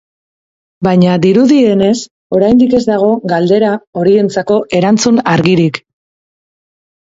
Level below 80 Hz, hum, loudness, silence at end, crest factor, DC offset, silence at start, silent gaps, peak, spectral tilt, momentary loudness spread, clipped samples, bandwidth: -48 dBFS; none; -10 LUFS; 1.25 s; 12 dB; under 0.1%; 0.8 s; 2.11-2.30 s, 3.87-3.93 s; 0 dBFS; -6 dB/octave; 6 LU; under 0.1%; 7.8 kHz